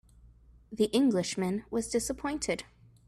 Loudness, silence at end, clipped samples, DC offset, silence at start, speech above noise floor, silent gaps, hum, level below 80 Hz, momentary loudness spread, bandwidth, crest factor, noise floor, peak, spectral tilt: -31 LUFS; 0.45 s; under 0.1%; under 0.1%; 0.25 s; 27 dB; none; none; -56 dBFS; 8 LU; 14 kHz; 18 dB; -57 dBFS; -14 dBFS; -4.5 dB/octave